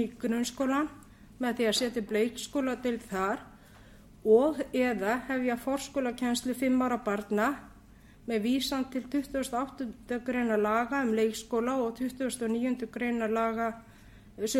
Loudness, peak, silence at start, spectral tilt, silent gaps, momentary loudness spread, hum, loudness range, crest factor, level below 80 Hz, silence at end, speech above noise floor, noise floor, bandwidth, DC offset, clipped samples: -30 LUFS; -12 dBFS; 0 s; -4 dB/octave; none; 7 LU; none; 3 LU; 18 dB; -58 dBFS; 0 s; 25 dB; -55 dBFS; 16.5 kHz; under 0.1%; under 0.1%